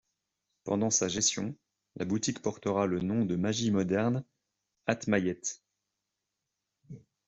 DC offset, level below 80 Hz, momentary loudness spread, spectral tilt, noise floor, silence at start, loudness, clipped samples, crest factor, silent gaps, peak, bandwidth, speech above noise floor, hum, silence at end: under 0.1%; -68 dBFS; 11 LU; -4 dB/octave; -86 dBFS; 0.65 s; -31 LUFS; under 0.1%; 22 dB; none; -10 dBFS; 8.2 kHz; 56 dB; none; 0.3 s